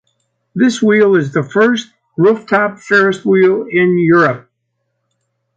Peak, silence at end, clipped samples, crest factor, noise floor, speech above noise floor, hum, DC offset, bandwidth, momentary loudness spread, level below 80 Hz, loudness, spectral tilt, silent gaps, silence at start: 0 dBFS; 1.15 s; under 0.1%; 14 dB; -69 dBFS; 58 dB; none; under 0.1%; 8.8 kHz; 6 LU; -60 dBFS; -12 LUFS; -6.5 dB/octave; none; 0.55 s